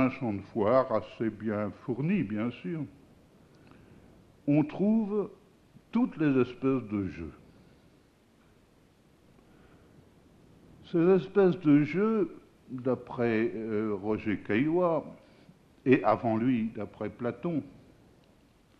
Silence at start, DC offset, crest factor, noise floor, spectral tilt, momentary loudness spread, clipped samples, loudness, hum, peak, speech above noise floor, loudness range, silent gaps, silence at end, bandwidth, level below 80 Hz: 0 s; under 0.1%; 20 dB; -62 dBFS; -9.5 dB/octave; 13 LU; under 0.1%; -29 LUFS; none; -10 dBFS; 34 dB; 7 LU; none; 1 s; 6.4 kHz; -64 dBFS